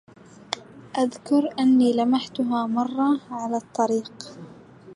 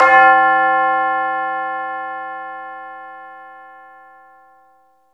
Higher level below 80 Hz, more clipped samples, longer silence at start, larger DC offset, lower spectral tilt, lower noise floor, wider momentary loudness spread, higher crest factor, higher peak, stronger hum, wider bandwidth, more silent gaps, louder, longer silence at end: second, -70 dBFS vs -64 dBFS; neither; first, 0.5 s vs 0 s; neither; about the same, -5 dB/octave vs -4 dB/octave; second, -46 dBFS vs -55 dBFS; second, 15 LU vs 25 LU; about the same, 20 dB vs 18 dB; second, -4 dBFS vs 0 dBFS; neither; first, 11 kHz vs 7.2 kHz; neither; second, -23 LUFS vs -15 LUFS; second, 0 s vs 1.45 s